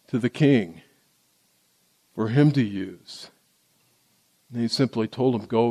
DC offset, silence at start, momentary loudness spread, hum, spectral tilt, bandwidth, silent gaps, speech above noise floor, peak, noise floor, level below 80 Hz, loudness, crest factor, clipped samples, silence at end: under 0.1%; 0.15 s; 20 LU; none; -7 dB/octave; 13 kHz; none; 43 dB; -8 dBFS; -65 dBFS; -66 dBFS; -23 LUFS; 18 dB; under 0.1%; 0 s